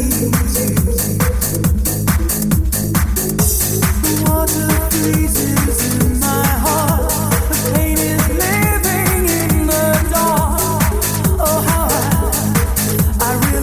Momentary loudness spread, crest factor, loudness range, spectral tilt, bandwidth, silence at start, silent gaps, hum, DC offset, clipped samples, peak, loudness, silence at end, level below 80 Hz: 2 LU; 14 dB; 1 LU; -4.5 dB/octave; 16 kHz; 0 s; none; none; under 0.1%; under 0.1%; 0 dBFS; -15 LUFS; 0 s; -20 dBFS